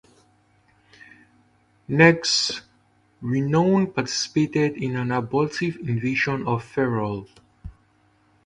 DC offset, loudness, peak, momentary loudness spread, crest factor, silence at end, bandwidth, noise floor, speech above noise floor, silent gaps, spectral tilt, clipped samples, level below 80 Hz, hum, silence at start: under 0.1%; -22 LUFS; -2 dBFS; 11 LU; 22 dB; 0.75 s; 11 kHz; -61 dBFS; 39 dB; none; -5 dB/octave; under 0.1%; -54 dBFS; none; 1.9 s